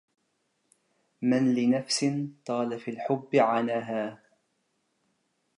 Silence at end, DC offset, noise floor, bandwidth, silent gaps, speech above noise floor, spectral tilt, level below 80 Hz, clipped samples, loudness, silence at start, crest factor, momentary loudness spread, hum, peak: 1.45 s; under 0.1%; -75 dBFS; 11 kHz; none; 49 dB; -5 dB/octave; -82 dBFS; under 0.1%; -28 LUFS; 1.2 s; 20 dB; 9 LU; none; -10 dBFS